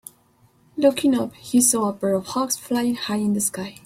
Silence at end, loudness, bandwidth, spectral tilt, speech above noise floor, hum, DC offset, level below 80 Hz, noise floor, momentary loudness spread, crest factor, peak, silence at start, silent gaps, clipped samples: 0.15 s; -21 LUFS; 16.5 kHz; -3.5 dB/octave; 37 dB; none; under 0.1%; -62 dBFS; -58 dBFS; 7 LU; 18 dB; -4 dBFS; 0.75 s; none; under 0.1%